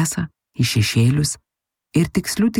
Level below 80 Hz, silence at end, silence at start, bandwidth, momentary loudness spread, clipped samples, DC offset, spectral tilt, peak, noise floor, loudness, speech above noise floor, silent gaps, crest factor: -46 dBFS; 0 s; 0 s; 16.5 kHz; 11 LU; under 0.1%; under 0.1%; -5 dB/octave; -4 dBFS; -79 dBFS; -20 LUFS; 61 dB; none; 14 dB